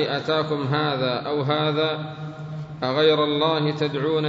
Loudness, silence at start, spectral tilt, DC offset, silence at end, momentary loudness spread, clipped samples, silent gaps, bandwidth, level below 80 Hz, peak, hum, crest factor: -22 LUFS; 0 s; -7 dB/octave; under 0.1%; 0 s; 14 LU; under 0.1%; none; 7.6 kHz; -62 dBFS; -6 dBFS; none; 16 dB